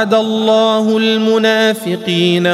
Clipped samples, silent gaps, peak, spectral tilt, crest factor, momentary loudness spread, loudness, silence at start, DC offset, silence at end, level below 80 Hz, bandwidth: under 0.1%; none; 0 dBFS; -5 dB/octave; 12 dB; 3 LU; -13 LUFS; 0 s; under 0.1%; 0 s; -62 dBFS; 15 kHz